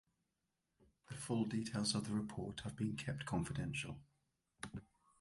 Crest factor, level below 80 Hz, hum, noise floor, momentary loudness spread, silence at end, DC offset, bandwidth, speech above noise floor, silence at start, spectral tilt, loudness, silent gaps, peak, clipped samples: 20 dB; -64 dBFS; none; -88 dBFS; 14 LU; 0.35 s; under 0.1%; 11.5 kHz; 46 dB; 1.1 s; -5 dB/octave; -42 LUFS; none; -24 dBFS; under 0.1%